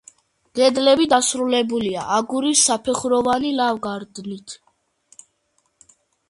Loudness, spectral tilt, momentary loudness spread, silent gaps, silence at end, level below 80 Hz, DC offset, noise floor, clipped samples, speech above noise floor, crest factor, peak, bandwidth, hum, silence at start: -18 LUFS; -2.5 dB/octave; 17 LU; none; 1.75 s; -60 dBFS; under 0.1%; -68 dBFS; under 0.1%; 48 dB; 18 dB; -2 dBFS; 11.5 kHz; none; 0.55 s